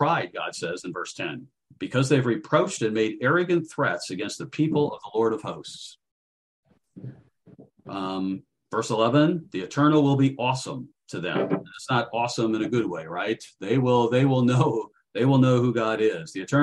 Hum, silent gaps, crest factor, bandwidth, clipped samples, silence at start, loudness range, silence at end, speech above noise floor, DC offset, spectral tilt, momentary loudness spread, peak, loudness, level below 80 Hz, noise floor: none; 6.11-6.63 s; 18 dB; 11.5 kHz; under 0.1%; 0 s; 8 LU; 0 s; 29 dB; under 0.1%; -6 dB/octave; 15 LU; -6 dBFS; -24 LUFS; -66 dBFS; -53 dBFS